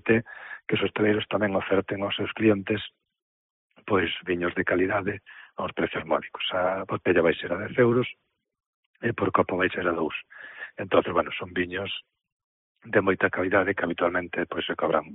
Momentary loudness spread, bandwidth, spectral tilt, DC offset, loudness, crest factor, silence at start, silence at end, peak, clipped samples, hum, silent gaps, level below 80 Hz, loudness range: 11 LU; 4 kHz; -3.5 dB/octave; under 0.1%; -26 LUFS; 20 dB; 0.05 s; 0 s; -6 dBFS; under 0.1%; none; 3.22-3.70 s, 8.66-8.94 s, 12.32-12.75 s; -60 dBFS; 3 LU